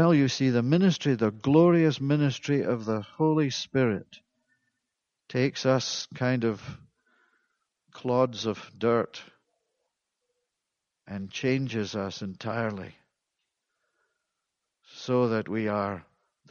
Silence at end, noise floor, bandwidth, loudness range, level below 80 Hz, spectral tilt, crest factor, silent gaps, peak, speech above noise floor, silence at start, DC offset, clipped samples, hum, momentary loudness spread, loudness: 0.5 s; -85 dBFS; 7.2 kHz; 10 LU; -68 dBFS; -6.5 dB/octave; 20 dB; none; -8 dBFS; 59 dB; 0 s; under 0.1%; under 0.1%; none; 14 LU; -27 LUFS